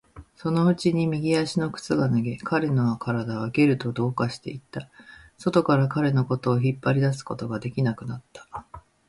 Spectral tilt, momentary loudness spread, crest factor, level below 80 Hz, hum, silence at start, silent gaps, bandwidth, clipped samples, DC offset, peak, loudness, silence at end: -7.5 dB/octave; 15 LU; 18 dB; -58 dBFS; none; 0.15 s; none; 11.5 kHz; under 0.1%; under 0.1%; -6 dBFS; -24 LUFS; 0.3 s